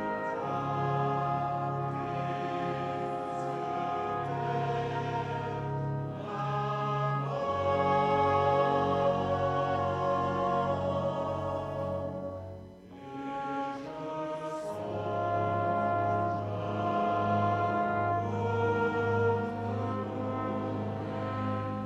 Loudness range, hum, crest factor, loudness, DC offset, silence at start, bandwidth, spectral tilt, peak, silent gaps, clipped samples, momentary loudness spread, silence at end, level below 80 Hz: 7 LU; none; 16 dB; -31 LUFS; under 0.1%; 0 s; 9 kHz; -8 dB/octave; -14 dBFS; none; under 0.1%; 9 LU; 0 s; -60 dBFS